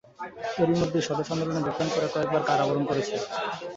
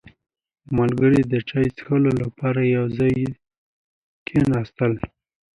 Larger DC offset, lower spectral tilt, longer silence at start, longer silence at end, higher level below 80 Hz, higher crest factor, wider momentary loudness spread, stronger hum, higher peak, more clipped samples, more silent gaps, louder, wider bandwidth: neither; second, -5.5 dB/octave vs -9 dB/octave; second, 0.2 s vs 0.7 s; second, 0 s vs 0.5 s; second, -60 dBFS vs -48 dBFS; about the same, 18 dB vs 16 dB; about the same, 7 LU vs 9 LU; neither; second, -10 dBFS vs -6 dBFS; neither; second, none vs 3.58-4.26 s; second, -27 LUFS vs -21 LUFS; second, 8 kHz vs 10.5 kHz